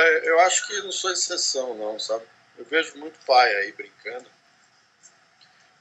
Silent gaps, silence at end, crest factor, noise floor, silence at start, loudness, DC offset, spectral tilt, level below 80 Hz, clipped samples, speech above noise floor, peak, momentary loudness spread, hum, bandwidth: none; 1.6 s; 22 dB; -60 dBFS; 0 s; -22 LUFS; under 0.1%; 1 dB/octave; -88 dBFS; under 0.1%; 36 dB; -4 dBFS; 19 LU; none; 9.4 kHz